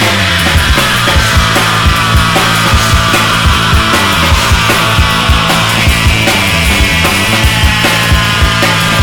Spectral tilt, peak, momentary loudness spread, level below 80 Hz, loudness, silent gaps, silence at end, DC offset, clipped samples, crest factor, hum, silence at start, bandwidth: -3.5 dB/octave; 0 dBFS; 1 LU; -16 dBFS; -8 LUFS; none; 0 s; under 0.1%; 0.3%; 8 dB; none; 0 s; over 20 kHz